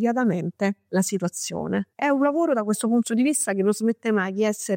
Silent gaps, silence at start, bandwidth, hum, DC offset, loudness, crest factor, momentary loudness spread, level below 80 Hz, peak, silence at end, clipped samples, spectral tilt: none; 0 s; 16.5 kHz; none; under 0.1%; -23 LUFS; 12 dB; 6 LU; -70 dBFS; -10 dBFS; 0 s; under 0.1%; -5 dB/octave